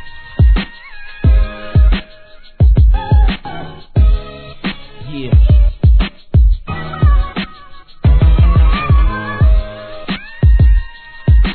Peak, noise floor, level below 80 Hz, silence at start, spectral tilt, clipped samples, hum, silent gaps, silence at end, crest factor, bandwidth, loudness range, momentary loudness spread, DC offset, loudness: 0 dBFS; -36 dBFS; -12 dBFS; 0 s; -10.5 dB/octave; under 0.1%; none; none; 0 s; 12 dB; 4.5 kHz; 2 LU; 17 LU; under 0.1%; -14 LUFS